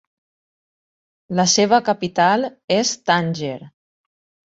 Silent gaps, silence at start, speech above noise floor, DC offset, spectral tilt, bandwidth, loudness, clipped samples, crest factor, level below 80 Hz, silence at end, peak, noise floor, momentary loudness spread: 2.64-2.68 s; 1.3 s; over 72 dB; under 0.1%; -3.5 dB/octave; 8 kHz; -18 LUFS; under 0.1%; 20 dB; -62 dBFS; 0.8 s; -2 dBFS; under -90 dBFS; 11 LU